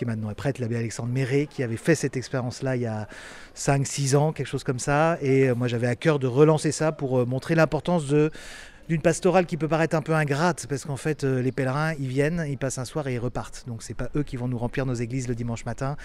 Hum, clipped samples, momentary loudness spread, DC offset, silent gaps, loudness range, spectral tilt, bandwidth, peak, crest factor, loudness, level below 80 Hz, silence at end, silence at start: none; under 0.1%; 9 LU; under 0.1%; none; 6 LU; -6 dB/octave; 13.5 kHz; -6 dBFS; 18 dB; -25 LUFS; -46 dBFS; 0 s; 0 s